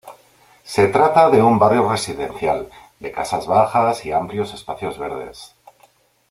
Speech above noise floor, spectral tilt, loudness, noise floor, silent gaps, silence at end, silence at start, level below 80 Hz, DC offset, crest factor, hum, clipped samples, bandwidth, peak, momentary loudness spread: 38 dB; -5.5 dB/octave; -18 LUFS; -56 dBFS; none; 0.85 s; 0.05 s; -52 dBFS; under 0.1%; 18 dB; none; under 0.1%; 15.5 kHz; -2 dBFS; 16 LU